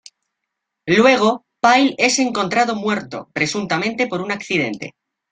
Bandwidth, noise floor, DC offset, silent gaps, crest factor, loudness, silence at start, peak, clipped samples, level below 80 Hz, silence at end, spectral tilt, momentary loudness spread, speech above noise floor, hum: 9.6 kHz; -79 dBFS; under 0.1%; none; 18 dB; -17 LUFS; 0.85 s; 0 dBFS; under 0.1%; -60 dBFS; 0.4 s; -3.5 dB/octave; 11 LU; 61 dB; none